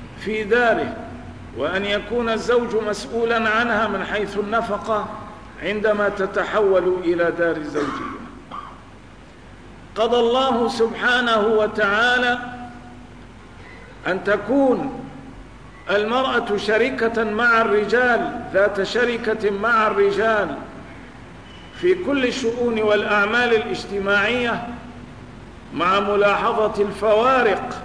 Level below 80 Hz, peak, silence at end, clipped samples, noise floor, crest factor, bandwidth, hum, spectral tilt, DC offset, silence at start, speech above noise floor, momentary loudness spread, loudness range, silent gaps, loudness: -46 dBFS; -8 dBFS; 0 s; under 0.1%; -43 dBFS; 14 dB; 10.5 kHz; none; -5 dB/octave; 0.3%; 0 s; 24 dB; 19 LU; 4 LU; none; -20 LUFS